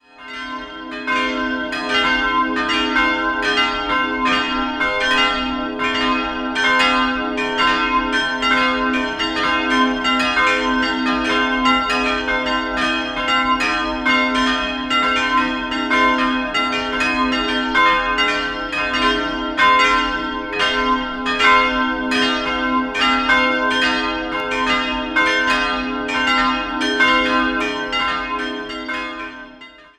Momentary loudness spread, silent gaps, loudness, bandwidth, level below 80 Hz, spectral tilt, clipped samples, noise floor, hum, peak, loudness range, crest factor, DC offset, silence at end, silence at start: 7 LU; none; -17 LUFS; 11.5 kHz; -40 dBFS; -3 dB/octave; under 0.1%; -41 dBFS; none; -2 dBFS; 2 LU; 18 dB; under 0.1%; 0.15 s; 0.2 s